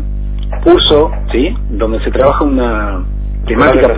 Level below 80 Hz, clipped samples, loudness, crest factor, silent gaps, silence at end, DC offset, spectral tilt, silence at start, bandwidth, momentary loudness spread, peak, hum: -18 dBFS; 0.7%; -12 LUFS; 10 dB; none; 0 s; under 0.1%; -10 dB/octave; 0 s; 4 kHz; 13 LU; 0 dBFS; 50 Hz at -15 dBFS